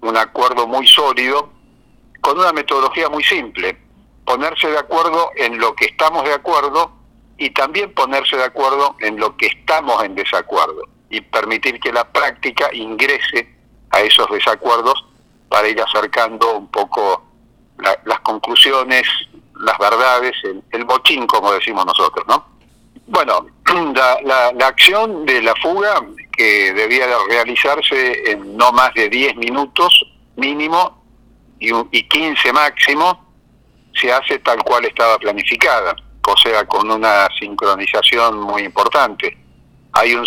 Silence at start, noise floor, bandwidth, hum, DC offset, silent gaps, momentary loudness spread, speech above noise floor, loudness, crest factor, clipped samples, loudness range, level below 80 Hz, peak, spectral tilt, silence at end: 0 s; -51 dBFS; over 20 kHz; none; under 0.1%; none; 10 LU; 36 dB; -14 LUFS; 16 dB; under 0.1%; 4 LU; -52 dBFS; 0 dBFS; -1.5 dB/octave; 0 s